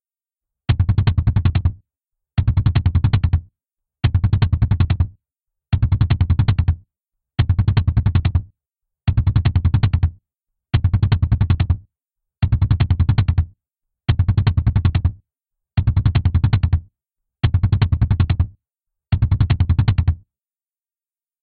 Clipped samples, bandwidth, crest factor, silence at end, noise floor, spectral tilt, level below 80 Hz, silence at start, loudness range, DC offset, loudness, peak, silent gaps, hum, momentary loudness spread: under 0.1%; 4.7 kHz; 16 dB; 1.25 s; under -90 dBFS; -11.5 dB/octave; -26 dBFS; 0.7 s; 1 LU; under 0.1%; -19 LUFS; -2 dBFS; none; none; 7 LU